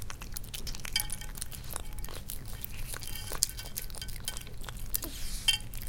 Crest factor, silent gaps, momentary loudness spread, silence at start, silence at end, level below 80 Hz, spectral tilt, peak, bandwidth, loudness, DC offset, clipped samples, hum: 36 dB; none; 12 LU; 0 s; 0 s; -40 dBFS; -1.5 dB/octave; 0 dBFS; 17 kHz; -36 LUFS; under 0.1%; under 0.1%; none